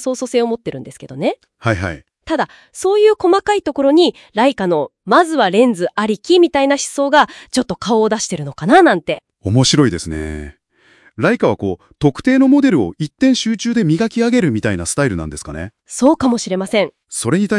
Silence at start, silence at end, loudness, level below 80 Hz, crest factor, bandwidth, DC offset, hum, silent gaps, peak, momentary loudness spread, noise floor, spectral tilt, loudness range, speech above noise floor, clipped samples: 0 s; 0 s; -15 LUFS; -44 dBFS; 16 dB; 12 kHz; under 0.1%; none; none; 0 dBFS; 12 LU; -52 dBFS; -5 dB/octave; 3 LU; 38 dB; under 0.1%